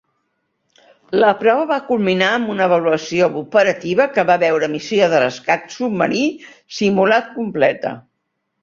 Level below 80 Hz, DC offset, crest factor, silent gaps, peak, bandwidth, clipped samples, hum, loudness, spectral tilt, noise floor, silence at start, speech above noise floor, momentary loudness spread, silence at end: -60 dBFS; under 0.1%; 16 dB; none; -2 dBFS; 7.6 kHz; under 0.1%; none; -17 LUFS; -5 dB/octave; -73 dBFS; 1.1 s; 56 dB; 8 LU; 0.65 s